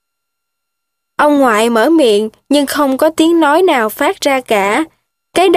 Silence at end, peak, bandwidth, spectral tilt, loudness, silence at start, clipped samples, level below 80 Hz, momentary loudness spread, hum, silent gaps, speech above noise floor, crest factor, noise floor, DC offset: 0 s; 0 dBFS; 15.5 kHz; -3.5 dB/octave; -12 LUFS; 1.2 s; under 0.1%; -54 dBFS; 6 LU; none; none; 64 dB; 12 dB; -75 dBFS; under 0.1%